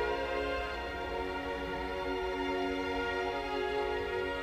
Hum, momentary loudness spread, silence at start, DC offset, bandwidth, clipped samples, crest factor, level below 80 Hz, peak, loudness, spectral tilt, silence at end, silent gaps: none; 3 LU; 0 s; under 0.1%; 16 kHz; under 0.1%; 12 dB; -48 dBFS; -22 dBFS; -35 LUFS; -5 dB/octave; 0 s; none